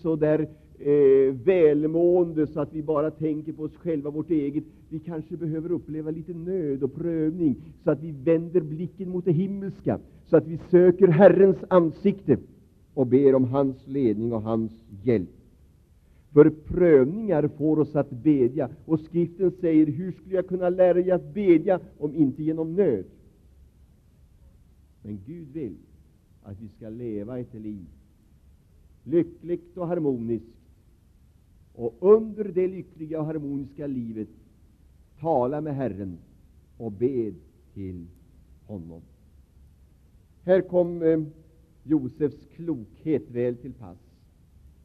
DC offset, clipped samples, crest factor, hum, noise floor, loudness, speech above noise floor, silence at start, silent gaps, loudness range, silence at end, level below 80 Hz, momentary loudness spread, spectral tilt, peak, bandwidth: under 0.1%; under 0.1%; 22 dB; none; -57 dBFS; -24 LUFS; 33 dB; 0.05 s; none; 14 LU; 0.9 s; -56 dBFS; 19 LU; -11 dB/octave; -4 dBFS; 4.5 kHz